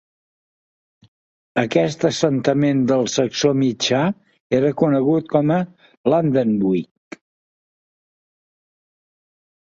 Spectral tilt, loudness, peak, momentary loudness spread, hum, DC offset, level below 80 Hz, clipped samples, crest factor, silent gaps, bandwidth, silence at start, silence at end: -5.5 dB/octave; -19 LUFS; -2 dBFS; 7 LU; none; under 0.1%; -60 dBFS; under 0.1%; 20 dB; 4.40-4.50 s, 5.97-6.04 s; 8 kHz; 1.55 s; 2.85 s